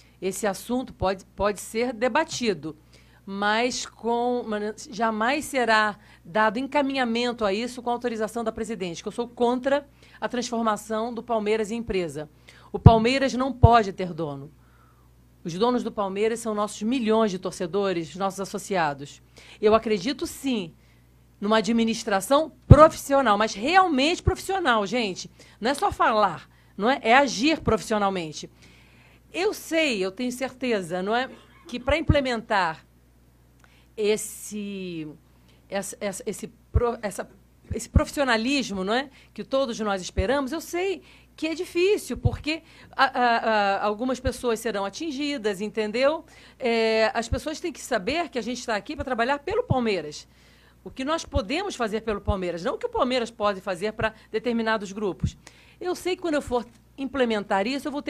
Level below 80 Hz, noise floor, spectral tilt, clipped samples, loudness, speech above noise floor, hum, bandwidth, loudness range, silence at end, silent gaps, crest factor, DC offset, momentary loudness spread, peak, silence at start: -40 dBFS; -57 dBFS; -5 dB/octave; under 0.1%; -25 LUFS; 32 dB; none; 15.5 kHz; 7 LU; 0 s; none; 26 dB; under 0.1%; 12 LU; 0 dBFS; 0.2 s